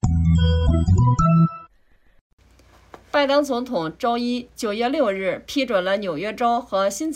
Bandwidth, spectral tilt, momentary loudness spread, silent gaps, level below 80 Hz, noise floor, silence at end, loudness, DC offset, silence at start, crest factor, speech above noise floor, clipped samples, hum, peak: 14.5 kHz; -6.5 dB/octave; 9 LU; 2.21-2.38 s; -34 dBFS; -57 dBFS; 0 s; -21 LUFS; under 0.1%; 0.05 s; 14 dB; 35 dB; under 0.1%; none; -8 dBFS